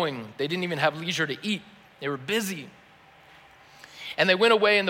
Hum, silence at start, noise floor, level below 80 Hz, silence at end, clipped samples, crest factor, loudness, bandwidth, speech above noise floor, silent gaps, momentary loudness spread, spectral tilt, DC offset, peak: none; 0 s; -54 dBFS; -72 dBFS; 0 s; under 0.1%; 20 dB; -25 LUFS; 16.5 kHz; 29 dB; none; 18 LU; -4 dB/octave; under 0.1%; -8 dBFS